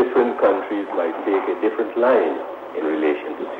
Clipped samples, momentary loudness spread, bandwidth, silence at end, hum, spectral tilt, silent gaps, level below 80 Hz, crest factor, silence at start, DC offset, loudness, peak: under 0.1%; 9 LU; 4.7 kHz; 0 s; none; -6.5 dB/octave; none; -66 dBFS; 14 dB; 0 s; under 0.1%; -21 LUFS; -6 dBFS